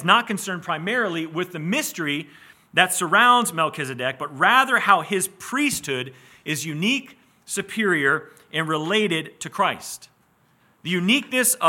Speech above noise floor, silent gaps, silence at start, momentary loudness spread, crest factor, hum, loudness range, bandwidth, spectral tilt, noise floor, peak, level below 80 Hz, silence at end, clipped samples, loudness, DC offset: 39 dB; none; 0 s; 12 LU; 22 dB; none; 5 LU; 17.5 kHz; -3 dB/octave; -61 dBFS; 0 dBFS; -70 dBFS; 0 s; under 0.1%; -21 LUFS; under 0.1%